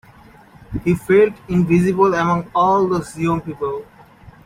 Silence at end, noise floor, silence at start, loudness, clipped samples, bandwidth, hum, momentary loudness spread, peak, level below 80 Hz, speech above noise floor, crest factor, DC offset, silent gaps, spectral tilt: 0.15 s; -45 dBFS; 0.7 s; -17 LUFS; under 0.1%; 15 kHz; none; 11 LU; -4 dBFS; -44 dBFS; 29 dB; 16 dB; under 0.1%; none; -7.5 dB/octave